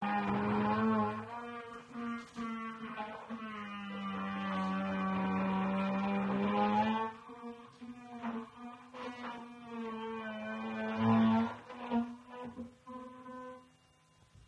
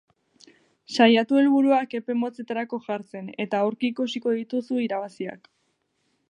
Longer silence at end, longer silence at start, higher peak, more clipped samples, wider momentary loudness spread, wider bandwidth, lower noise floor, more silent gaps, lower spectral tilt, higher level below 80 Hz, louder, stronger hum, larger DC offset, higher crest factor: second, 0 s vs 0.95 s; second, 0 s vs 0.9 s; second, -18 dBFS vs -4 dBFS; neither; first, 18 LU vs 14 LU; second, 8.8 kHz vs 9.8 kHz; second, -67 dBFS vs -72 dBFS; neither; first, -7.5 dB/octave vs -5.5 dB/octave; first, -70 dBFS vs -80 dBFS; second, -36 LUFS vs -24 LUFS; neither; neither; about the same, 18 dB vs 20 dB